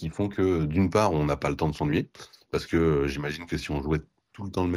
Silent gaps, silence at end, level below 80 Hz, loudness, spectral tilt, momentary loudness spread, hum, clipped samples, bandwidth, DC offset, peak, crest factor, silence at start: none; 0 s; -42 dBFS; -27 LUFS; -7 dB/octave; 9 LU; none; under 0.1%; 14.5 kHz; under 0.1%; -10 dBFS; 18 dB; 0 s